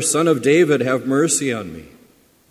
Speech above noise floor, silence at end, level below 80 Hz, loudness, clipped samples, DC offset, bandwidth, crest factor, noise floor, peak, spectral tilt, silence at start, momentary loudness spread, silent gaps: 36 dB; 0.65 s; -56 dBFS; -17 LUFS; under 0.1%; under 0.1%; 16 kHz; 16 dB; -53 dBFS; -2 dBFS; -4 dB/octave; 0 s; 11 LU; none